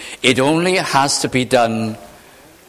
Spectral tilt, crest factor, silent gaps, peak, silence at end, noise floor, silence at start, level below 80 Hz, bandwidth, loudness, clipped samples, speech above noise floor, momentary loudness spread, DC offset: -3.5 dB/octave; 18 dB; none; 0 dBFS; 0.55 s; -44 dBFS; 0 s; -52 dBFS; 16 kHz; -16 LUFS; under 0.1%; 29 dB; 9 LU; under 0.1%